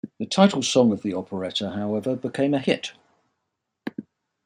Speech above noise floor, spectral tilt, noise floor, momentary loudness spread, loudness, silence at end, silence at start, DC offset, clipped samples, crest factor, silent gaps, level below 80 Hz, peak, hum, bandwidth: 57 dB; -5 dB/octave; -80 dBFS; 17 LU; -23 LUFS; 0.45 s; 0.05 s; under 0.1%; under 0.1%; 22 dB; none; -70 dBFS; -2 dBFS; none; 11 kHz